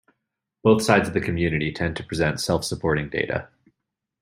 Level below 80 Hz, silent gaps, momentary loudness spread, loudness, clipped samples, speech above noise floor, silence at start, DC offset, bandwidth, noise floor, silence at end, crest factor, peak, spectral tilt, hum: -48 dBFS; none; 8 LU; -23 LUFS; under 0.1%; 60 dB; 0.65 s; under 0.1%; 16 kHz; -82 dBFS; 0.75 s; 22 dB; -2 dBFS; -5.5 dB/octave; none